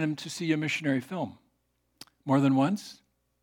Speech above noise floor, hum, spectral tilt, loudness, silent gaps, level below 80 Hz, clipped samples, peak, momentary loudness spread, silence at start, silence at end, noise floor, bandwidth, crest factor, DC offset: 47 dB; none; -6 dB/octave; -28 LUFS; none; -78 dBFS; under 0.1%; -12 dBFS; 14 LU; 0 s; 0.5 s; -75 dBFS; 16 kHz; 18 dB; under 0.1%